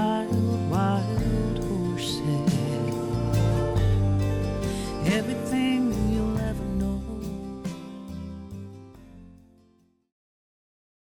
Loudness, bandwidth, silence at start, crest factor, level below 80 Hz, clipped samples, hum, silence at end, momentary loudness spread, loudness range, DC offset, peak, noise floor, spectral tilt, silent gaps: -26 LUFS; 18 kHz; 0 s; 14 dB; -38 dBFS; under 0.1%; none; 1.75 s; 14 LU; 15 LU; under 0.1%; -12 dBFS; -63 dBFS; -7 dB/octave; none